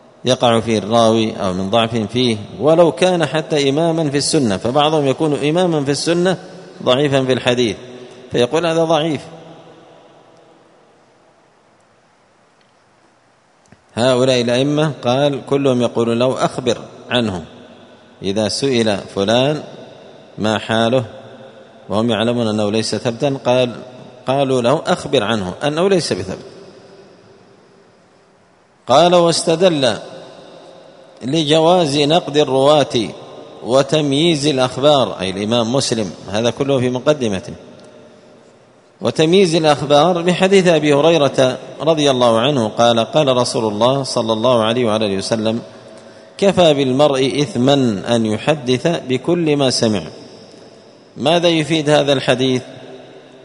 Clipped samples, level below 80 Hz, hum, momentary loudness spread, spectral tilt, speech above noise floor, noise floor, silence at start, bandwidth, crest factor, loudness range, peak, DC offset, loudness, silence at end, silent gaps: under 0.1%; -54 dBFS; none; 11 LU; -5 dB/octave; 39 dB; -54 dBFS; 0.25 s; 11 kHz; 16 dB; 6 LU; 0 dBFS; under 0.1%; -15 LUFS; 0.25 s; none